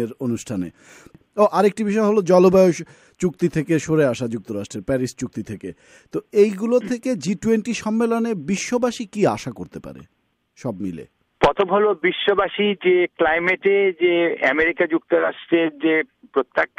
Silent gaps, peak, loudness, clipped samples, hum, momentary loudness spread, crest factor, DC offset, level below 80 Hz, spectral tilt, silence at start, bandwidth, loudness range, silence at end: none; -4 dBFS; -20 LUFS; under 0.1%; none; 14 LU; 16 dB; under 0.1%; -52 dBFS; -5.5 dB/octave; 0 s; 14.5 kHz; 5 LU; 0.15 s